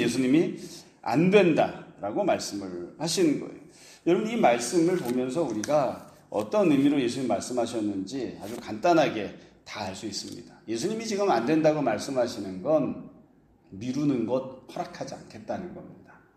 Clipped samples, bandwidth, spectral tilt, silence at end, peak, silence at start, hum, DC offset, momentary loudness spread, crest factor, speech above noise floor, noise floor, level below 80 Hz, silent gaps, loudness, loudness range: under 0.1%; 14.5 kHz; -5.5 dB/octave; 0.35 s; -6 dBFS; 0 s; none; under 0.1%; 16 LU; 20 dB; 33 dB; -59 dBFS; -66 dBFS; none; -27 LUFS; 5 LU